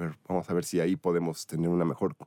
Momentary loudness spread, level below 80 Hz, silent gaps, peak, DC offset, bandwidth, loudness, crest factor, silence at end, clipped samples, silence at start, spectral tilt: 5 LU; -64 dBFS; none; -14 dBFS; under 0.1%; 16.5 kHz; -30 LUFS; 14 dB; 0 s; under 0.1%; 0 s; -6.5 dB/octave